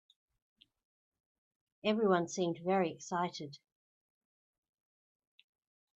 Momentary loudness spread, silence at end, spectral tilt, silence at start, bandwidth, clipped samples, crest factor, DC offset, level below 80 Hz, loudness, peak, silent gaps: 10 LU; 2.4 s; -5.5 dB/octave; 1.85 s; 8.2 kHz; under 0.1%; 22 dB; under 0.1%; -82 dBFS; -34 LUFS; -16 dBFS; none